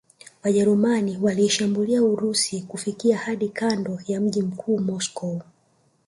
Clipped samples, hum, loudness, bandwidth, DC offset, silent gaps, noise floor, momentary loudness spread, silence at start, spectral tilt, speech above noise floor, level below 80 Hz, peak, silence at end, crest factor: under 0.1%; none; -23 LUFS; 11.5 kHz; under 0.1%; none; -64 dBFS; 9 LU; 0.45 s; -4.5 dB/octave; 41 dB; -66 dBFS; -8 dBFS; 0.65 s; 16 dB